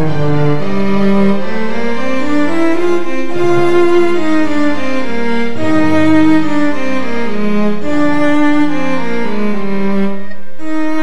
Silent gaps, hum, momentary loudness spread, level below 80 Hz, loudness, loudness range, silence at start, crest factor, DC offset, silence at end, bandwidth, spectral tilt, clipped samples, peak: none; none; 8 LU; -48 dBFS; -14 LUFS; 2 LU; 0 s; 14 dB; 30%; 0 s; 11 kHz; -7 dB/octave; under 0.1%; 0 dBFS